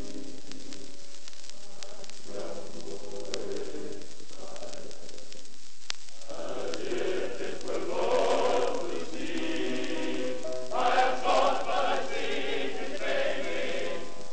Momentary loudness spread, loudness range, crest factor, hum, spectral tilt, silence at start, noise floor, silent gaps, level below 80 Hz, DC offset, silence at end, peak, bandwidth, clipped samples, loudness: 20 LU; 12 LU; 26 dB; none; -3.5 dB/octave; 0 s; -52 dBFS; none; -62 dBFS; 5%; 0 s; -6 dBFS; 9 kHz; under 0.1%; -32 LUFS